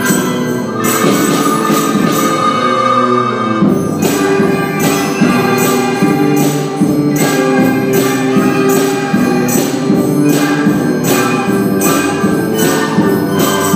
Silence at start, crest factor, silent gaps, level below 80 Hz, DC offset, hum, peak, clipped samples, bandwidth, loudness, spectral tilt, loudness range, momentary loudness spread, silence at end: 0 s; 12 dB; none; -50 dBFS; under 0.1%; none; 0 dBFS; under 0.1%; 16 kHz; -12 LUFS; -5 dB/octave; 0 LU; 2 LU; 0 s